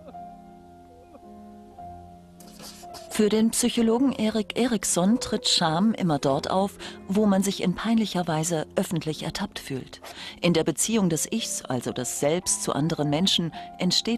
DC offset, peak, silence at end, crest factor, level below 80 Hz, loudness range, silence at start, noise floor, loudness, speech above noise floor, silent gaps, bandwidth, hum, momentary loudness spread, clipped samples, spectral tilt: under 0.1%; -10 dBFS; 0 s; 16 dB; -56 dBFS; 4 LU; 0 s; -49 dBFS; -24 LUFS; 24 dB; none; 13 kHz; none; 19 LU; under 0.1%; -4 dB/octave